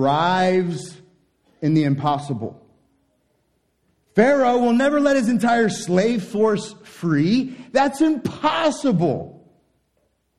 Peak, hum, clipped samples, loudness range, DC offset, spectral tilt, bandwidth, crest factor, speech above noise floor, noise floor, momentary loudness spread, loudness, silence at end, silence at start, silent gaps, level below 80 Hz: -2 dBFS; none; under 0.1%; 6 LU; under 0.1%; -6 dB/octave; 13 kHz; 20 dB; 49 dB; -68 dBFS; 12 LU; -20 LUFS; 1.05 s; 0 s; none; -60 dBFS